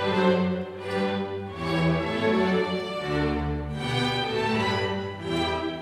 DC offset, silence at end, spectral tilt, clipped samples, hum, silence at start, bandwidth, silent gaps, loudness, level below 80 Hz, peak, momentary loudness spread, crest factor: under 0.1%; 0 s; -6 dB/octave; under 0.1%; none; 0 s; 13 kHz; none; -26 LUFS; -44 dBFS; -10 dBFS; 7 LU; 16 dB